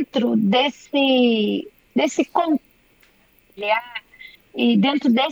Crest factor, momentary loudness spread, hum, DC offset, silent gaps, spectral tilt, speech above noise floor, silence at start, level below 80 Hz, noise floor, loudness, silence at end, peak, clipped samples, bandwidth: 16 dB; 11 LU; none; under 0.1%; none; -5.5 dB/octave; 38 dB; 0 s; -66 dBFS; -57 dBFS; -20 LUFS; 0 s; -4 dBFS; under 0.1%; 15 kHz